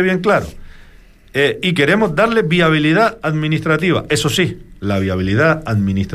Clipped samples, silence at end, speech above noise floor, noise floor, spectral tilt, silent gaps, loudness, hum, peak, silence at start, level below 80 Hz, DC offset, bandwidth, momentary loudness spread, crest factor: under 0.1%; 0 s; 28 dB; -43 dBFS; -5.5 dB/octave; none; -15 LUFS; none; -2 dBFS; 0 s; -40 dBFS; under 0.1%; 15 kHz; 6 LU; 14 dB